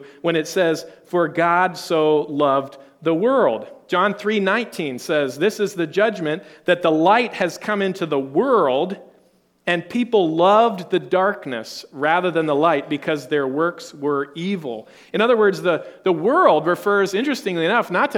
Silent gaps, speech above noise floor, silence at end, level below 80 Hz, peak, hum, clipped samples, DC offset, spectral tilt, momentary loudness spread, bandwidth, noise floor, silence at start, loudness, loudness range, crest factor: none; 39 dB; 0 s; -70 dBFS; 0 dBFS; none; under 0.1%; under 0.1%; -5.5 dB/octave; 10 LU; 17 kHz; -58 dBFS; 0 s; -20 LUFS; 3 LU; 18 dB